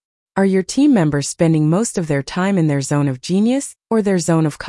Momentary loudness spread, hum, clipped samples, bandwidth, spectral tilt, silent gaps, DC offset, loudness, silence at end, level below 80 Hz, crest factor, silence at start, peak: 6 LU; none; under 0.1%; 12 kHz; -6 dB/octave; none; under 0.1%; -17 LUFS; 0 s; -52 dBFS; 12 dB; 0.35 s; -4 dBFS